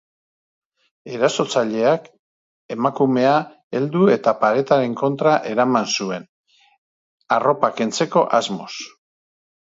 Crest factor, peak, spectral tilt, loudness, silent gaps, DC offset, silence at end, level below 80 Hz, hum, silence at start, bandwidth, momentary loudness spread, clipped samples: 20 dB; 0 dBFS; -5 dB/octave; -19 LUFS; 2.19-2.69 s, 3.64-3.70 s, 6.29-6.44 s, 6.78-7.18 s; under 0.1%; 0.75 s; -70 dBFS; none; 1.05 s; 8 kHz; 12 LU; under 0.1%